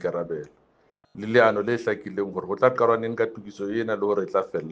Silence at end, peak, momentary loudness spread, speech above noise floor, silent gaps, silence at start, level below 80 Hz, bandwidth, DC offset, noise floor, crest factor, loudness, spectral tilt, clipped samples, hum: 0 s; -4 dBFS; 12 LU; 40 dB; none; 0 s; -68 dBFS; 7.8 kHz; under 0.1%; -64 dBFS; 22 dB; -24 LUFS; -7 dB/octave; under 0.1%; none